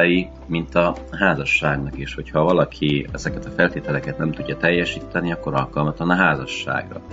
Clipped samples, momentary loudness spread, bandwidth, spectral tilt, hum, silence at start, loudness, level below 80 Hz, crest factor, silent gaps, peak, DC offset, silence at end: under 0.1%; 9 LU; 7.8 kHz; -6 dB/octave; none; 0 s; -21 LUFS; -40 dBFS; 20 dB; none; 0 dBFS; under 0.1%; 0 s